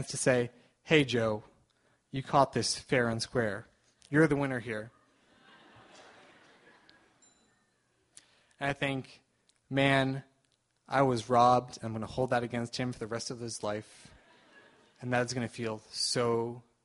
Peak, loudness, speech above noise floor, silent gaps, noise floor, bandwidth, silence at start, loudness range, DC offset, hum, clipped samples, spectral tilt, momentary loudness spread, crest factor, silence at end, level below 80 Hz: -8 dBFS; -31 LUFS; 44 dB; none; -74 dBFS; 11.5 kHz; 0 s; 11 LU; under 0.1%; none; under 0.1%; -4.5 dB/octave; 13 LU; 24 dB; 0.25 s; -64 dBFS